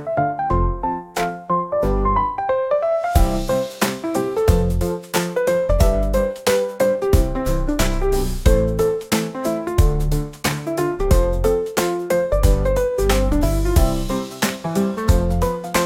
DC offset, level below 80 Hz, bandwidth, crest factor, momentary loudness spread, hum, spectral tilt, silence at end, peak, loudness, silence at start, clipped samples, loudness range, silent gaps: under 0.1%; -22 dBFS; 17 kHz; 16 dB; 5 LU; none; -5.5 dB/octave; 0 s; -2 dBFS; -20 LUFS; 0 s; under 0.1%; 1 LU; none